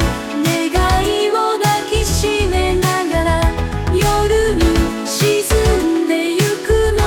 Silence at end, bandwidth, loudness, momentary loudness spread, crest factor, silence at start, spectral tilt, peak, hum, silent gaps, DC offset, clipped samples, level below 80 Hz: 0 s; 19 kHz; -16 LUFS; 3 LU; 12 dB; 0 s; -5 dB/octave; -2 dBFS; none; none; under 0.1%; under 0.1%; -22 dBFS